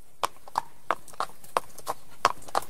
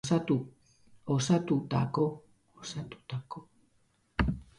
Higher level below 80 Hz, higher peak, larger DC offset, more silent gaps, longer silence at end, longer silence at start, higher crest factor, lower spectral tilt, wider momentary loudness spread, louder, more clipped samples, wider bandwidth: second, -62 dBFS vs -48 dBFS; first, 0 dBFS vs -12 dBFS; first, 2% vs under 0.1%; neither; second, 0 s vs 0.15 s; about the same, 0 s vs 0.05 s; first, 32 dB vs 20 dB; second, -2 dB/octave vs -6 dB/octave; second, 9 LU vs 19 LU; about the same, -32 LUFS vs -32 LUFS; neither; first, 16 kHz vs 11.5 kHz